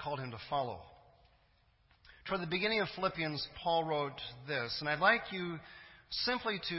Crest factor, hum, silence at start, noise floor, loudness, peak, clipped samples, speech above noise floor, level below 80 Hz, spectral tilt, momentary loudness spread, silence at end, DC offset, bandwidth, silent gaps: 24 dB; none; 0 s; -70 dBFS; -35 LUFS; -14 dBFS; under 0.1%; 34 dB; -64 dBFS; -7.5 dB/octave; 15 LU; 0 s; under 0.1%; 5.8 kHz; none